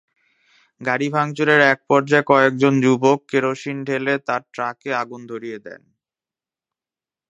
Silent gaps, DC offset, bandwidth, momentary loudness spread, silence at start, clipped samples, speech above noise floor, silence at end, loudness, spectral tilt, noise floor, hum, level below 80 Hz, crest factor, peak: none; under 0.1%; 10 kHz; 15 LU; 0.8 s; under 0.1%; over 71 dB; 1.6 s; -18 LUFS; -6 dB/octave; under -90 dBFS; none; -70 dBFS; 20 dB; 0 dBFS